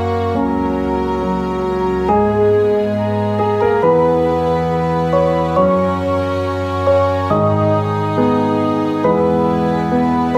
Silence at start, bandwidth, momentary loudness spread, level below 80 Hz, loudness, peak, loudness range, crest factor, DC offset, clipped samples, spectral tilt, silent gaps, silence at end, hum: 0 s; 13 kHz; 5 LU; -36 dBFS; -16 LUFS; -2 dBFS; 1 LU; 12 dB; under 0.1%; under 0.1%; -8.5 dB/octave; none; 0 s; none